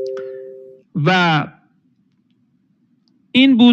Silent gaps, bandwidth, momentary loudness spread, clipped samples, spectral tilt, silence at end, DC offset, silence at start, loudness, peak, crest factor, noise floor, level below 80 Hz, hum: none; 7.2 kHz; 20 LU; under 0.1%; -6.5 dB/octave; 0 s; under 0.1%; 0 s; -16 LUFS; 0 dBFS; 18 dB; -61 dBFS; -66 dBFS; none